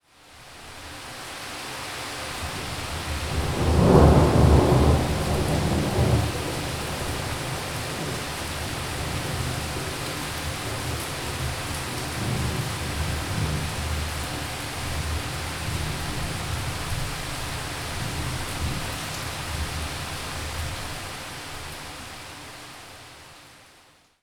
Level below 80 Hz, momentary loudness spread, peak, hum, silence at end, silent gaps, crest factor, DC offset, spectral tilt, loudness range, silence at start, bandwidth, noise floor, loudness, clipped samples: -34 dBFS; 16 LU; 0 dBFS; none; 0.6 s; none; 26 dB; under 0.1%; -5 dB/octave; 12 LU; 0.25 s; 20 kHz; -56 dBFS; -26 LUFS; under 0.1%